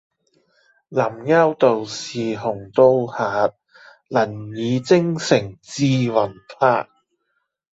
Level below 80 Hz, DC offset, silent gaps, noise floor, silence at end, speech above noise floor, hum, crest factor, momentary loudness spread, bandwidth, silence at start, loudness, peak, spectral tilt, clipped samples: -60 dBFS; under 0.1%; none; -72 dBFS; 0.9 s; 54 dB; none; 18 dB; 10 LU; 8 kHz; 0.9 s; -20 LUFS; -2 dBFS; -6 dB/octave; under 0.1%